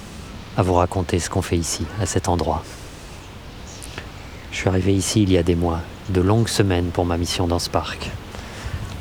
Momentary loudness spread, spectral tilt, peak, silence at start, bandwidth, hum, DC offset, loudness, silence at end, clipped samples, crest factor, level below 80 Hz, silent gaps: 19 LU; -5.5 dB/octave; -2 dBFS; 0 s; 18 kHz; none; under 0.1%; -21 LUFS; 0 s; under 0.1%; 20 dB; -40 dBFS; none